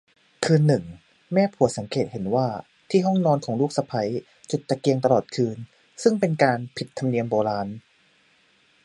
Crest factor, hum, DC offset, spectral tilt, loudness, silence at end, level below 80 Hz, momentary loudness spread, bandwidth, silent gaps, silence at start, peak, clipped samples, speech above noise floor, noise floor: 20 dB; none; under 0.1%; -6.5 dB/octave; -24 LUFS; 1.05 s; -60 dBFS; 12 LU; 11.5 kHz; none; 0.4 s; -4 dBFS; under 0.1%; 39 dB; -61 dBFS